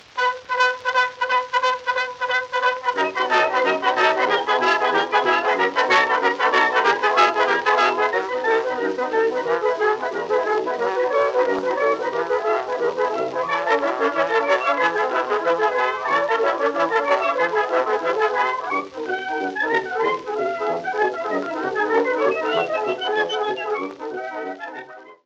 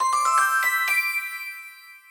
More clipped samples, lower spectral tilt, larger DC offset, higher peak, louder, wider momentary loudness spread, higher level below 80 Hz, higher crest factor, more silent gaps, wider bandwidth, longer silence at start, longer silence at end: neither; first, -3 dB/octave vs 3 dB/octave; neither; first, -4 dBFS vs -8 dBFS; about the same, -20 LUFS vs -21 LUFS; second, 7 LU vs 17 LU; first, -68 dBFS vs -74 dBFS; about the same, 18 dB vs 14 dB; neither; second, 8.4 kHz vs over 20 kHz; first, 0.15 s vs 0 s; about the same, 0.1 s vs 0.1 s